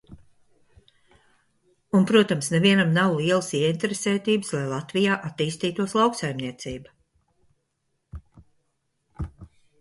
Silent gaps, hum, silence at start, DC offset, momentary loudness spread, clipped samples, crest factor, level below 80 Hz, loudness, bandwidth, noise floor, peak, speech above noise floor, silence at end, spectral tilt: none; none; 0.1 s; under 0.1%; 18 LU; under 0.1%; 22 dB; -52 dBFS; -23 LUFS; 11.5 kHz; -75 dBFS; -4 dBFS; 52 dB; 0.35 s; -5 dB/octave